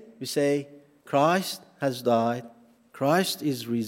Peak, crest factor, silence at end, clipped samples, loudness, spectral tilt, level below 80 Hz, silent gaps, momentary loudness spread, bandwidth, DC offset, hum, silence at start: -8 dBFS; 18 dB; 0 s; under 0.1%; -26 LUFS; -5 dB/octave; -78 dBFS; none; 8 LU; 16.5 kHz; under 0.1%; none; 0.05 s